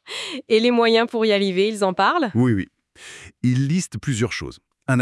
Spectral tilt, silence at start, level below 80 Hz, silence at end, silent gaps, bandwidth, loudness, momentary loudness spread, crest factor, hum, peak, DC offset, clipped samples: -5.5 dB/octave; 0.05 s; -56 dBFS; 0 s; none; 12 kHz; -20 LUFS; 18 LU; 16 dB; none; -4 dBFS; under 0.1%; under 0.1%